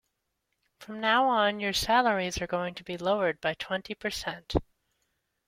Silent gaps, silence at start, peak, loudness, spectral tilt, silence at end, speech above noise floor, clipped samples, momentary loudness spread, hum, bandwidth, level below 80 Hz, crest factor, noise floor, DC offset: none; 0.8 s; -8 dBFS; -28 LUFS; -3.5 dB/octave; 0.85 s; 52 dB; under 0.1%; 10 LU; none; 16.5 kHz; -50 dBFS; 22 dB; -80 dBFS; under 0.1%